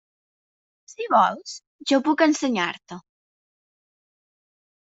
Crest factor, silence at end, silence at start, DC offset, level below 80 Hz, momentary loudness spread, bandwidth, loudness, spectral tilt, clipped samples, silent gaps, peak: 20 dB; 1.95 s; 1 s; under 0.1%; -72 dBFS; 18 LU; 8 kHz; -21 LUFS; -3.5 dB/octave; under 0.1%; 1.67-1.79 s; -6 dBFS